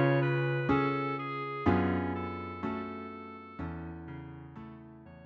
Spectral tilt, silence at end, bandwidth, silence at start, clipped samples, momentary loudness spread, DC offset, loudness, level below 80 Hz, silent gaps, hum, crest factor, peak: -9.5 dB/octave; 0 s; 5.6 kHz; 0 s; under 0.1%; 18 LU; under 0.1%; -33 LUFS; -56 dBFS; none; none; 20 dB; -12 dBFS